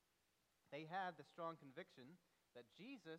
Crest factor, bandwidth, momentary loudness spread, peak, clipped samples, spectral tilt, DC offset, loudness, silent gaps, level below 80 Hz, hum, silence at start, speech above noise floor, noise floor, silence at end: 20 dB; 12 kHz; 17 LU; -36 dBFS; under 0.1%; -5.5 dB/octave; under 0.1%; -54 LUFS; none; under -90 dBFS; none; 0.7 s; 30 dB; -85 dBFS; 0 s